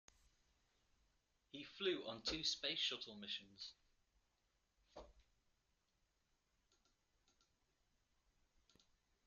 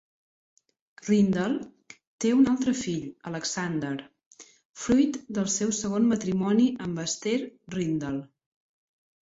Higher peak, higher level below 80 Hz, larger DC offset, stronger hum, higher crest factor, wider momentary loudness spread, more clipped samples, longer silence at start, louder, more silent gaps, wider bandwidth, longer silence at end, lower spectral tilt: second, -28 dBFS vs -10 dBFS; second, -76 dBFS vs -60 dBFS; neither; neither; first, 24 dB vs 18 dB; first, 22 LU vs 12 LU; neither; first, 1.55 s vs 1.05 s; second, -44 LUFS vs -27 LUFS; second, none vs 2.07-2.18 s, 4.26-4.31 s, 4.65-4.73 s; second, 7.2 kHz vs 8 kHz; first, 4.05 s vs 1 s; second, -0.5 dB/octave vs -5 dB/octave